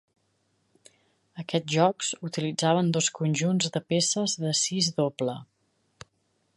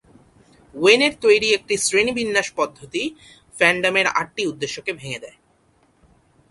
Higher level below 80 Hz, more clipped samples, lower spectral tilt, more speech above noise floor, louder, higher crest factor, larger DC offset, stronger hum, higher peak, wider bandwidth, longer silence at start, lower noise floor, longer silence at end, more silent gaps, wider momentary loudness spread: second, -72 dBFS vs -58 dBFS; neither; first, -4 dB/octave vs -2.5 dB/octave; first, 46 dB vs 40 dB; second, -26 LUFS vs -19 LUFS; about the same, 20 dB vs 22 dB; neither; neither; second, -8 dBFS vs 0 dBFS; about the same, 11.5 kHz vs 11.5 kHz; first, 1.35 s vs 0.75 s; first, -72 dBFS vs -60 dBFS; about the same, 1.15 s vs 1.2 s; neither; second, 8 LU vs 13 LU